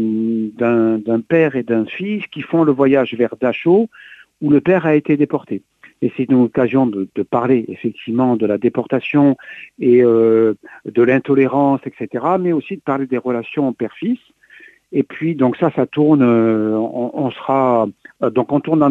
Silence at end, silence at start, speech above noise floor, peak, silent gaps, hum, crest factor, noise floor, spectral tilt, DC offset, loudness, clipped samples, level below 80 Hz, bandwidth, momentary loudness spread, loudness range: 0 s; 0 s; 30 dB; -2 dBFS; none; none; 14 dB; -45 dBFS; -9.5 dB/octave; under 0.1%; -16 LUFS; under 0.1%; -60 dBFS; 4.2 kHz; 10 LU; 4 LU